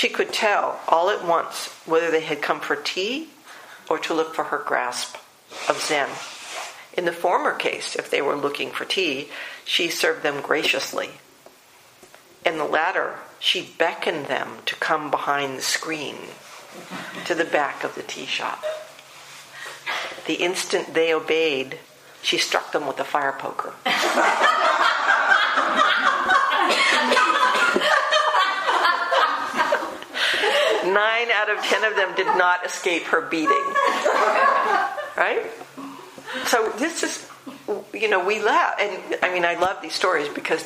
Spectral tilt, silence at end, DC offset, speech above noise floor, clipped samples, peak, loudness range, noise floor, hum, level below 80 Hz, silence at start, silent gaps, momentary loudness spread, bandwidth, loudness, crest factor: -1.5 dB/octave; 0 s; under 0.1%; 29 dB; under 0.1%; 0 dBFS; 8 LU; -51 dBFS; none; -72 dBFS; 0 s; none; 15 LU; 15.5 kHz; -21 LUFS; 22 dB